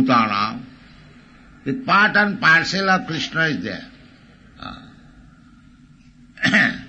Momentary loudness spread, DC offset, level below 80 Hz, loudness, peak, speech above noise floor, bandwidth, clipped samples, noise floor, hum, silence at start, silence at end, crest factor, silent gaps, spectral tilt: 21 LU; under 0.1%; -54 dBFS; -18 LUFS; -2 dBFS; 31 dB; 8.6 kHz; under 0.1%; -49 dBFS; none; 0 s; 0 s; 18 dB; none; -4.5 dB/octave